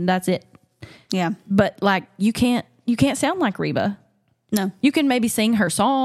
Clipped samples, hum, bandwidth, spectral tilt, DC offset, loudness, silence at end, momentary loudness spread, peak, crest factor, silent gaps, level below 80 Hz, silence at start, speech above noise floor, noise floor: under 0.1%; none; 15.5 kHz; -5 dB/octave; under 0.1%; -21 LUFS; 0 s; 7 LU; -4 dBFS; 18 dB; none; -52 dBFS; 0 s; 25 dB; -45 dBFS